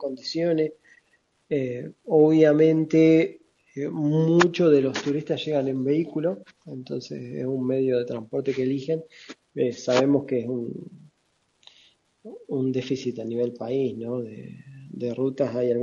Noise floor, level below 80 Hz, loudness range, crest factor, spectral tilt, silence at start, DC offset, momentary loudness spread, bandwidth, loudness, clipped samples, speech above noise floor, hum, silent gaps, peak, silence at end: -70 dBFS; -68 dBFS; 9 LU; 22 dB; -7 dB/octave; 0 s; under 0.1%; 19 LU; 7.4 kHz; -24 LUFS; under 0.1%; 46 dB; none; none; -2 dBFS; 0 s